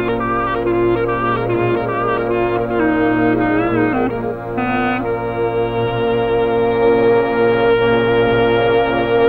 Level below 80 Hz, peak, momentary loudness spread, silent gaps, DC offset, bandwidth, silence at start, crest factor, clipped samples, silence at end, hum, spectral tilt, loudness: -38 dBFS; -4 dBFS; 5 LU; none; under 0.1%; 4.9 kHz; 0 s; 12 dB; under 0.1%; 0 s; none; -9 dB/octave; -16 LUFS